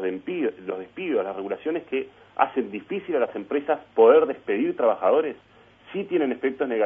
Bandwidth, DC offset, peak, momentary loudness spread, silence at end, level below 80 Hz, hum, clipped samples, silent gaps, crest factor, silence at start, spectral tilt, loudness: 3.7 kHz; under 0.1%; -4 dBFS; 14 LU; 0 s; -70 dBFS; none; under 0.1%; none; 20 dB; 0 s; -8.5 dB/octave; -24 LUFS